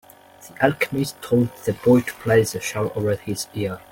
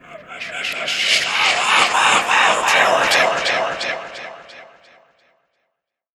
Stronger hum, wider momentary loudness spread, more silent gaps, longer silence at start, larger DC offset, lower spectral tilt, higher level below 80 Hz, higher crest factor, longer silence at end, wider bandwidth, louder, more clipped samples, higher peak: neither; second, 8 LU vs 17 LU; neither; first, 0.4 s vs 0.1 s; neither; first, -5.5 dB/octave vs 0 dB/octave; first, -54 dBFS vs -62 dBFS; about the same, 20 dB vs 20 dB; second, 0.15 s vs 1.55 s; second, 17 kHz vs over 20 kHz; second, -22 LUFS vs -15 LUFS; neither; about the same, -2 dBFS vs 0 dBFS